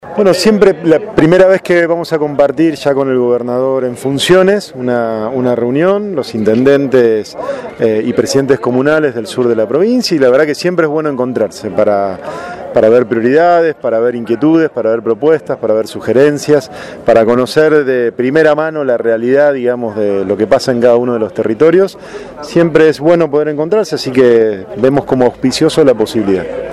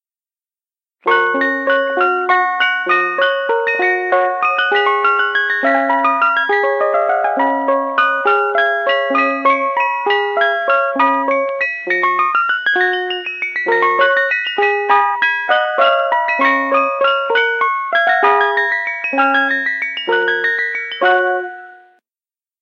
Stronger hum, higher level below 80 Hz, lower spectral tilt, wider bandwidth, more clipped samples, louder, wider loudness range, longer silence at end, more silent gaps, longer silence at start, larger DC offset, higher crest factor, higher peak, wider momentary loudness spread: neither; first, -46 dBFS vs -76 dBFS; first, -6 dB/octave vs -3 dB/octave; first, 13 kHz vs 7 kHz; first, 0.2% vs under 0.1%; first, -11 LUFS vs -14 LUFS; about the same, 2 LU vs 2 LU; second, 0 s vs 0.85 s; neither; second, 0.05 s vs 1.05 s; neither; about the same, 10 dB vs 14 dB; about the same, 0 dBFS vs 0 dBFS; first, 7 LU vs 4 LU